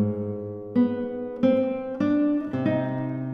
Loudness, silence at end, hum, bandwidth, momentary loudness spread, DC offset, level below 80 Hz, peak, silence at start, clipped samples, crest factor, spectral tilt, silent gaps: -25 LUFS; 0 s; none; 5.6 kHz; 8 LU; under 0.1%; -62 dBFS; -10 dBFS; 0 s; under 0.1%; 16 dB; -10 dB/octave; none